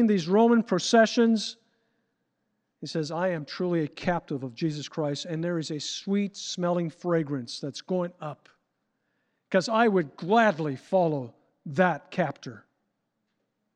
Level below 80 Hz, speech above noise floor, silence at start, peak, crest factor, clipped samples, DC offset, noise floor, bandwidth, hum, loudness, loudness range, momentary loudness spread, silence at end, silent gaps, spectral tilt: -68 dBFS; 52 dB; 0 s; -8 dBFS; 20 dB; under 0.1%; under 0.1%; -79 dBFS; 9.4 kHz; none; -27 LUFS; 5 LU; 13 LU; 1.15 s; none; -5.5 dB/octave